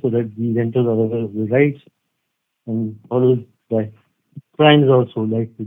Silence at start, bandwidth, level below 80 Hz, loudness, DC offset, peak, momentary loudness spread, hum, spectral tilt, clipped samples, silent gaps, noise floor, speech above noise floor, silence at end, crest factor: 0.05 s; 16.5 kHz; -68 dBFS; -18 LUFS; under 0.1%; 0 dBFS; 13 LU; none; -10.5 dB/octave; under 0.1%; none; -75 dBFS; 58 dB; 0 s; 18 dB